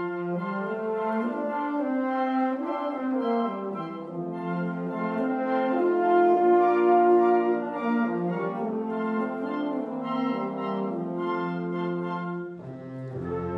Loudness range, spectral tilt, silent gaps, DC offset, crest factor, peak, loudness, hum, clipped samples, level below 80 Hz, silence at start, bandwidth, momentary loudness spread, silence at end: 7 LU; -9 dB/octave; none; under 0.1%; 16 dB; -10 dBFS; -27 LUFS; none; under 0.1%; -68 dBFS; 0 s; 5.6 kHz; 12 LU; 0 s